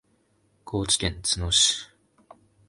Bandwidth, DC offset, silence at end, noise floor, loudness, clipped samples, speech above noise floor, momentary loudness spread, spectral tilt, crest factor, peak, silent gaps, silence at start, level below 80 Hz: 11.5 kHz; under 0.1%; 0.85 s; -67 dBFS; -23 LUFS; under 0.1%; 42 dB; 13 LU; -2 dB/octave; 20 dB; -8 dBFS; none; 0.65 s; -44 dBFS